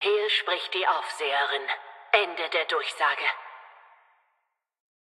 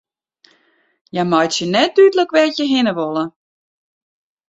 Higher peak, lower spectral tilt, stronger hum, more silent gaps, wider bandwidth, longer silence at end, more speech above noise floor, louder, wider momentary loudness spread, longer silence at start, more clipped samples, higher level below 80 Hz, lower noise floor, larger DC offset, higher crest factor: about the same, -4 dBFS vs -2 dBFS; second, 0.5 dB/octave vs -4.5 dB/octave; neither; neither; first, 12.5 kHz vs 8 kHz; first, 1.45 s vs 1.2 s; first, 51 dB vs 44 dB; second, -26 LUFS vs -15 LUFS; second, 8 LU vs 11 LU; second, 0 s vs 1.15 s; neither; second, under -90 dBFS vs -64 dBFS; first, -78 dBFS vs -59 dBFS; neither; first, 24 dB vs 16 dB